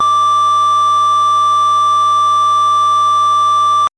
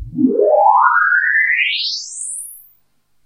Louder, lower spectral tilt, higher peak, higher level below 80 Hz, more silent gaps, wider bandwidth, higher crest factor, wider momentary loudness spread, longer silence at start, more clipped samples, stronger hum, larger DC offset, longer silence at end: first, -10 LUFS vs -14 LUFS; second, -1 dB/octave vs -2.5 dB/octave; second, -6 dBFS vs 0 dBFS; second, -54 dBFS vs -48 dBFS; neither; second, 11 kHz vs 16 kHz; second, 6 dB vs 16 dB; second, 0 LU vs 13 LU; about the same, 0 s vs 0 s; neither; neither; second, under 0.1% vs 0.1%; second, 0.1 s vs 0.65 s